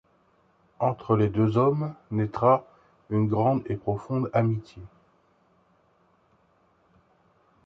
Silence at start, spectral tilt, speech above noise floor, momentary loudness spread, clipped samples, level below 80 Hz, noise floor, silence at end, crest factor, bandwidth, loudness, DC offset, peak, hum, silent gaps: 0.8 s; -10.5 dB/octave; 40 dB; 9 LU; under 0.1%; -56 dBFS; -65 dBFS; 2.8 s; 20 dB; 6.2 kHz; -26 LUFS; under 0.1%; -8 dBFS; none; none